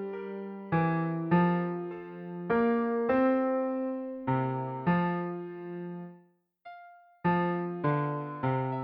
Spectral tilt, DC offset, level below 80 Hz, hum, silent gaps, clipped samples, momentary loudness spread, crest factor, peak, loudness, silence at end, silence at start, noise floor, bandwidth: -11.5 dB/octave; under 0.1%; -66 dBFS; none; none; under 0.1%; 15 LU; 18 dB; -14 dBFS; -30 LUFS; 0 s; 0 s; -62 dBFS; 4.9 kHz